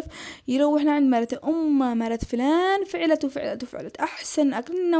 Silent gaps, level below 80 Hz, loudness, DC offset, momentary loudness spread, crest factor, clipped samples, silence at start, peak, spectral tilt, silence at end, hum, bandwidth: none; -52 dBFS; -24 LUFS; under 0.1%; 10 LU; 14 dB; under 0.1%; 0 s; -10 dBFS; -4.5 dB/octave; 0 s; none; 8 kHz